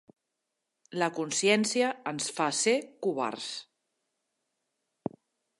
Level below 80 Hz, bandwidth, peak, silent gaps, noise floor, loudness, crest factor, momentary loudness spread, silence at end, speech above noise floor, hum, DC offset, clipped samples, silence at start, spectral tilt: -80 dBFS; 11.5 kHz; -10 dBFS; none; -84 dBFS; -29 LUFS; 22 dB; 16 LU; 1.95 s; 55 dB; none; under 0.1%; under 0.1%; 0.9 s; -3 dB/octave